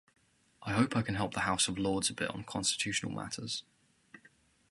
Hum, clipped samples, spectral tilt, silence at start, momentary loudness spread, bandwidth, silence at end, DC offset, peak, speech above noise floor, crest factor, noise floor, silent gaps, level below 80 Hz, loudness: none; under 0.1%; -3.5 dB/octave; 0.6 s; 9 LU; 12 kHz; 0.55 s; under 0.1%; -12 dBFS; 32 dB; 22 dB; -66 dBFS; none; -60 dBFS; -33 LUFS